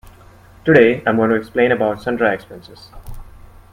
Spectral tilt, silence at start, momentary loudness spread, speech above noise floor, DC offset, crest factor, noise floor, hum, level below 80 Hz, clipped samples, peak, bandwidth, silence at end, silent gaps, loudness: -7.5 dB/octave; 0.65 s; 15 LU; 28 dB; under 0.1%; 18 dB; -44 dBFS; none; -42 dBFS; under 0.1%; 0 dBFS; 15 kHz; 0.45 s; none; -16 LUFS